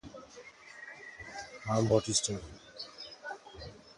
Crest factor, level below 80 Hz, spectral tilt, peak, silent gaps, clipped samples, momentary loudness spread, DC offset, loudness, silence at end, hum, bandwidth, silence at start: 24 dB; -60 dBFS; -4 dB/octave; -14 dBFS; none; under 0.1%; 22 LU; under 0.1%; -33 LUFS; 0.05 s; none; 11.5 kHz; 0.05 s